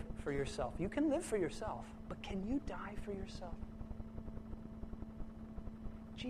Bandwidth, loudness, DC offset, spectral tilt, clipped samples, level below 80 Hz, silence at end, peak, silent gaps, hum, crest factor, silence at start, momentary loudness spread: 14 kHz; -43 LUFS; under 0.1%; -6 dB/octave; under 0.1%; -50 dBFS; 0 s; -24 dBFS; none; none; 18 dB; 0 s; 14 LU